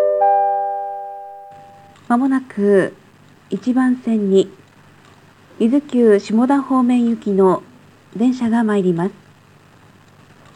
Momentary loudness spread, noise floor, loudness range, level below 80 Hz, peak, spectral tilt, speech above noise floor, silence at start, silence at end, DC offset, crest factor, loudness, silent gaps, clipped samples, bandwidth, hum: 12 LU; -48 dBFS; 4 LU; -66 dBFS; -2 dBFS; -7.5 dB/octave; 33 dB; 0 s; 1.45 s; under 0.1%; 16 dB; -17 LUFS; none; under 0.1%; 10.5 kHz; none